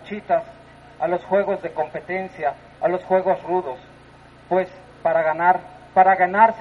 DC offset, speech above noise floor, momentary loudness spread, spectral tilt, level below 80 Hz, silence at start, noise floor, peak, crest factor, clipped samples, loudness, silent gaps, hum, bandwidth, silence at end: under 0.1%; 27 dB; 12 LU; -7.5 dB/octave; -58 dBFS; 0 s; -47 dBFS; -2 dBFS; 20 dB; under 0.1%; -21 LUFS; none; none; 6.4 kHz; 0 s